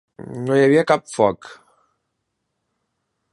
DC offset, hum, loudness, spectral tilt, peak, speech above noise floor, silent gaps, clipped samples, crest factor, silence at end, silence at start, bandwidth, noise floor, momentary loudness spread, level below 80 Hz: under 0.1%; none; -18 LUFS; -6 dB/octave; -2 dBFS; 58 dB; none; under 0.1%; 20 dB; 1.8 s; 0.2 s; 11 kHz; -76 dBFS; 18 LU; -62 dBFS